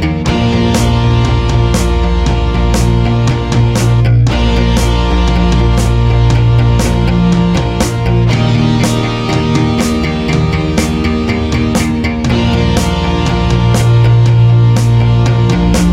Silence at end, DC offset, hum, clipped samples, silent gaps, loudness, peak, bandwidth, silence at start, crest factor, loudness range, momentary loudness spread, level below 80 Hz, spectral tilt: 0 s; under 0.1%; none; under 0.1%; none; -11 LUFS; 0 dBFS; 13 kHz; 0 s; 10 dB; 3 LU; 4 LU; -16 dBFS; -6.5 dB/octave